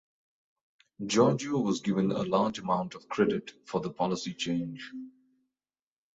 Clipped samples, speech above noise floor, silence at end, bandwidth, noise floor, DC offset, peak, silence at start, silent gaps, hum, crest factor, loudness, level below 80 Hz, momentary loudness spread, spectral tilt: under 0.1%; over 61 dB; 1.05 s; 8.2 kHz; under -90 dBFS; under 0.1%; -10 dBFS; 1 s; none; none; 20 dB; -30 LUFS; -68 dBFS; 16 LU; -5.5 dB/octave